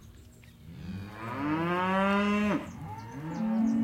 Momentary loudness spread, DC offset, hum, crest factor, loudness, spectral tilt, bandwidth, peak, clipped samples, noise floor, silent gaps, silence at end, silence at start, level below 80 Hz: 16 LU; under 0.1%; none; 16 dB; -30 LUFS; -7 dB/octave; 13 kHz; -14 dBFS; under 0.1%; -52 dBFS; none; 0 s; 0 s; -58 dBFS